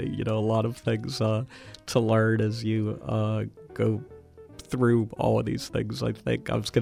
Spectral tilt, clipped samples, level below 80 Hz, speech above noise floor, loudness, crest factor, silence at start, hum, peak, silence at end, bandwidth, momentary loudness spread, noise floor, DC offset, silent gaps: -7 dB/octave; under 0.1%; -54 dBFS; 21 dB; -27 LUFS; 18 dB; 0 s; none; -8 dBFS; 0 s; 14 kHz; 10 LU; -48 dBFS; under 0.1%; none